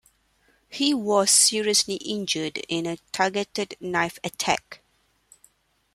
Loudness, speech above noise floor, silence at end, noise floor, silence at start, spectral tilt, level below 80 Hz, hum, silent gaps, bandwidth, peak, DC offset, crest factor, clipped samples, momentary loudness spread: -23 LUFS; 40 dB; 1.2 s; -65 dBFS; 0.7 s; -2 dB/octave; -64 dBFS; none; none; 15.5 kHz; -6 dBFS; under 0.1%; 20 dB; under 0.1%; 12 LU